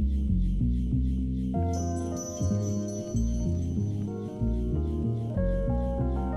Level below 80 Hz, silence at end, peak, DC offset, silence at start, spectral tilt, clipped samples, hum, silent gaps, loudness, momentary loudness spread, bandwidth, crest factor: -32 dBFS; 0 s; -16 dBFS; under 0.1%; 0 s; -8 dB/octave; under 0.1%; none; none; -30 LUFS; 4 LU; 11 kHz; 12 dB